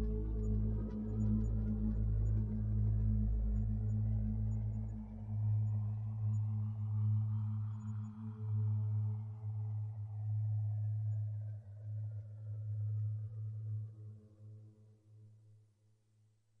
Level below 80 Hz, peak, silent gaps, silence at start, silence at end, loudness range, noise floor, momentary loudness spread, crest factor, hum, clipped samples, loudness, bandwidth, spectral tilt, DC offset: -44 dBFS; -24 dBFS; none; 0 s; 1.05 s; 8 LU; -72 dBFS; 10 LU; 14 dB; none; under 0.1%; -39 LUFS; 1.7 kHz; -12 dB/octave; under 0.1%